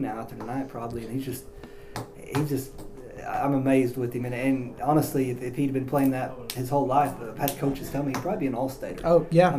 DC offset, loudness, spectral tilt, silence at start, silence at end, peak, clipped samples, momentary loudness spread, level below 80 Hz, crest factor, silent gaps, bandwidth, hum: under 0.1%; -27 LUFS; -6.5 dB/octave; 0 s; 0 s; -6 dBFS; under 0.1%; 16 LU; -48 dBFS; 20 dB; none; 15.5 kHz; none